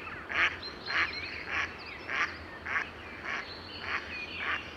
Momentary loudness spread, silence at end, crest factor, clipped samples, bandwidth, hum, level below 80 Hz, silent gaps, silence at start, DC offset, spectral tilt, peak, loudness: 11 LU; 0 s; 22 dB; under 0.1%; 16 kHz; none; -58 dBFS; none; 0 s; under 0.1%; -3 dB/octave; -14 dBFS; -33 LUFS